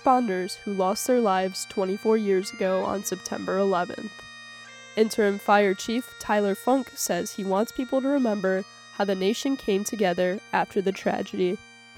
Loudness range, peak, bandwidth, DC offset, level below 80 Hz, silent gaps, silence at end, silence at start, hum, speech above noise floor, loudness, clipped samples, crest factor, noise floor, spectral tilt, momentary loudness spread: 2 LU; -6 dBFS; 18 kHz; under 0.1%; -64 dBFS; none; 0.35 s; 0 s; none; 20 dB; -25 LUFS; under 0.1%; 18 dB; -45 dBFS; -4.5 dB/octave; 9 LU